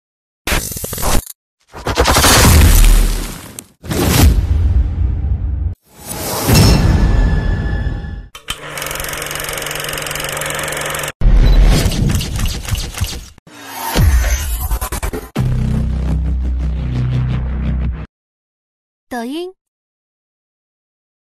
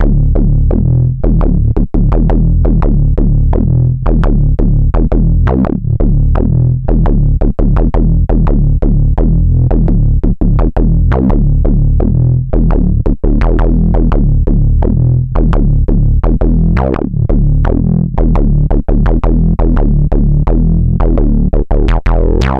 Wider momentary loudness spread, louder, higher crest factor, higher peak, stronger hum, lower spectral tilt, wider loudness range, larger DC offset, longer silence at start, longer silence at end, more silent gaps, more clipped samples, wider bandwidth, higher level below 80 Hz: first, 16 LU vs 2 LU; second, -16 LUFS vs -12 LUFS; first, 14 dB vs 6 dB; about the same, -2 dBFS vs -4 dBFS; neither; second, -4.5 dB/octave vs -10.5 dB/octave; first, 9 LU vs 1 LU; neither; first, 0.45 s vs 0 s; first, 1.8 s vs 0 s; first, 1.35-1.58 s, 11.15-11.20 s, 13.39-13.46 s, 18.09-19.07 s vs none; neither; first, 15.5 kHz vs 3.8 kHz; second, -18 dBFS vs -10 dBFS